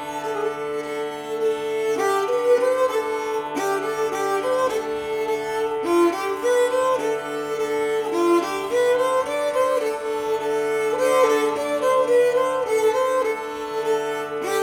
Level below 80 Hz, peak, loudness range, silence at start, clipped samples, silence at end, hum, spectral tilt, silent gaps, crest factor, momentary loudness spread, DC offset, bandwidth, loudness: -62 dBFS; -6 dBFS; 2 LU; 0 s; under 0.1%; 0 s; none; -3.5 dB/octave; none; 16 dB; 8 LU; under 0.1%; 19 kHz; -22 LUFS